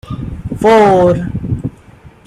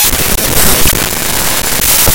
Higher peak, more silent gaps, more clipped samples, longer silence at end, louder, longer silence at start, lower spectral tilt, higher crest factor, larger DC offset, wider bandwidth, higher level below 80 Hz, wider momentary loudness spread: about the same, 0 dBFS vs 0 dBFS; neither; second, under 0.1% vs 0.9%; first, 0.2 s vs 0 s; second, -11 LUFS vs -8 LUFS; about the same, 0.05 s vs 0 s; first, -7.5 dB/octave vs -2 dB/octave; about the same, 12 dB vs 10 dB; neither; second, 13 kHz vs over 20 kHz; second, -34 dBFS vs -20 dBFS; first, 17 LU vs 4 LU